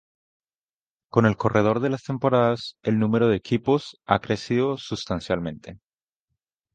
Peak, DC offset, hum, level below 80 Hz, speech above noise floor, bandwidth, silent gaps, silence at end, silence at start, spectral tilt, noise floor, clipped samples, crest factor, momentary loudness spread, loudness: -2 dBFS; under 0.1%; none; -52 dBFS; over 67 dB; 9 kHz; none; 1 s; 1.15 s; -7 dB/octave; under -90 dBFS; under 0.1%; 22 dB; 8 LU; -23 LUFS